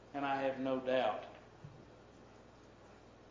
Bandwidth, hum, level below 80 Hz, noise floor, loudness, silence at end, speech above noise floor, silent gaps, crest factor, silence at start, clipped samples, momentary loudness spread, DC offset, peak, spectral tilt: 7.6 kHz; none; -70 dBFS; -59 dBFS; -37 LUFS; 0 s; 23 dB; none; 20 dB; 0 s; under 0.1%; 24 LU; under 0.1%; -22 dBFS; -6 dB/octave